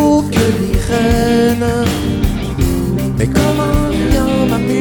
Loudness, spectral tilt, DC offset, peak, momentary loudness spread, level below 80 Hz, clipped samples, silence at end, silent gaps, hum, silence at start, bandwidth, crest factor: -14 LUFS; -6 dB/octave; under 0.1%; 0 dBFS; 4 LU; -22 dBFS; under 0.1%; 0 s; none; none; 0 s; over 20 kHz; 12 dB